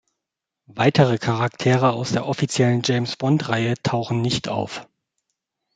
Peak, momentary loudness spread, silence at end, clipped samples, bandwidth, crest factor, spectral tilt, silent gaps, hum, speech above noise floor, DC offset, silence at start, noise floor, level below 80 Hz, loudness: -2 dBFS; 7 LU; 0.95 s; under 0.1%; 9.4 kHz; 18 dB; -6 dB/octave; none; none; 64 dB; under 0.1%; 0.7 s; -84 dBFS; -56 dBFS; -21 LUFS